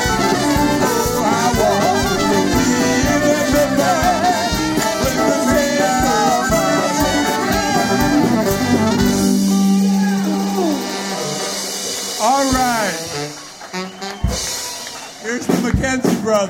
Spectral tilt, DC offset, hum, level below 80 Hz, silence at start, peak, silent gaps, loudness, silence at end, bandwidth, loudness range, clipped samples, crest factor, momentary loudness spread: -4 dB/octave; under 0.1%; none; -34 dBFS; 0 s; -2 dBFS; none; -16 LUFS; 0 s; 17 kHz; 5 LU; under 0.1%; 14 dB; 8 LU